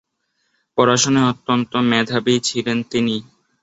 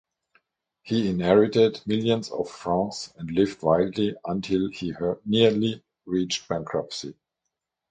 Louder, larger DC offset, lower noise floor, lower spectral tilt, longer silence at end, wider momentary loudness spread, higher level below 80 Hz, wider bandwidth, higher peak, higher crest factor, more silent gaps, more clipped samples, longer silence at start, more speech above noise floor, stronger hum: first, -18 LUFS vs -25 LUFS; neither; second, -69 dBFS vs -83 dBFS; second, -4 dB/octave vs -6 dB/octave; second, 0.4 s vs 0.8 s; second, 7 LU vs 11 LU; about the same, -58 dBFS vs -56 dBFS; second, 8 kHz vs 9.2 kHz; about the same, -2 dBFS vs -4 dBFS; about the same, 18 dB vs 20 dB; neither; neither; about the same, 0.75 s vs 0.85 s; second, 52 dB vs 59 dB; neither